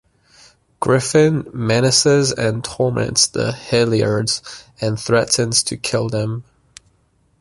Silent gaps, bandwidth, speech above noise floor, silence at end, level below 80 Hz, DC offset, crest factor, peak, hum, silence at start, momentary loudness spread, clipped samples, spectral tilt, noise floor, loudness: none; 11.5 kHz; 43 dB; 1 s; -50 dBFS; under 0.1%; 18 dB; -2 dBFS; none; 0.8 s; 10 LU; under 0.1%; -4 dB/octave; -60 dBFS; -17 LUFS